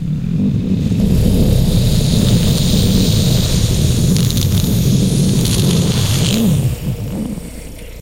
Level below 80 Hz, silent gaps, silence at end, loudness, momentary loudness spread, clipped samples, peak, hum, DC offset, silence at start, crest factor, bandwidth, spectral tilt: -22 dBFS; none; 0 s; -14 LUFS; 9 LU; under 0.1%; 0 dBFS; none; 0.2%; 0 s; 14 dB; 17 kHz; -5.5 dB/octave